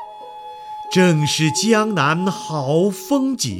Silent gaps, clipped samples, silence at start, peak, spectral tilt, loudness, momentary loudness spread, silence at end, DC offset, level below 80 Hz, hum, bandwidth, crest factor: none; under 0.1%; 0 s; -2 dBFS; -4.5 dB/octave; -18 LUFS; 19 LU; 0 s; under 0.1%; -62 dBFS; none; 17.5 kHz; 16 dB